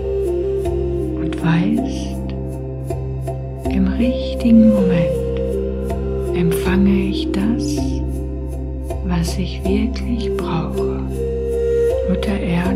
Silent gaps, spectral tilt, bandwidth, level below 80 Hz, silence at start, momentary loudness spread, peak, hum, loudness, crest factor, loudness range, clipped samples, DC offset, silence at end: none; -7.5 dB/octave; 15.5 kHz; -26 dBFS; 0 s; 10 LU; -2 dBFS; none; -19 LUFS; 16 dB; 5 LU; under 0.1%; under 0.1%; 0 s